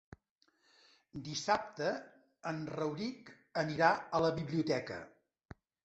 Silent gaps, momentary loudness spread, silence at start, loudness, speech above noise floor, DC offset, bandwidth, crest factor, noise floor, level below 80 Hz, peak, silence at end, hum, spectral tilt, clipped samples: none; 17 LU; 1.15 s; -36 LUFS; 40 dB; under 0.1%; 8.2 kHz; 24 dB; -76 dBFS; -68 dBFS; -14 dBFS; 0.75 s; none; -5 dB/octave; under 0.1%